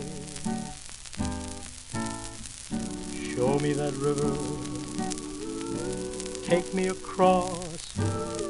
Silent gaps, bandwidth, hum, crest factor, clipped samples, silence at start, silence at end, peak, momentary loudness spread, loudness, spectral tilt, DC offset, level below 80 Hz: none; 12 kHz; none; 22 dB; under 0.1%; 0 s; 0 s; -8 dBFS; 12 LU; -30 LUFS; -5 dB/octave; under 0.1%; -48 dBFS